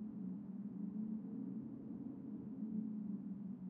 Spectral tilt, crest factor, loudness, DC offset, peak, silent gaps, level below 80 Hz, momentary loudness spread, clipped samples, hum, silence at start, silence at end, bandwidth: -12.5 dB/octave; 14 dB; -47 LUFS; under 0.1%; -32 dBFS; none; -82 dBFS; 5 LU; under 0.1%; none; 0 s; 0 s; 2.3 kHz